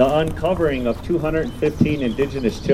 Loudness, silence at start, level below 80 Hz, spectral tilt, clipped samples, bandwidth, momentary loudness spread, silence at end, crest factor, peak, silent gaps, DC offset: -21 LUFS; 0 s; -34 dBFS; -7 dB/octave; under 0.1%; 16 kHz; 4 LU; 0 s; 16 dB; -2 dBFS; none; under 0.1%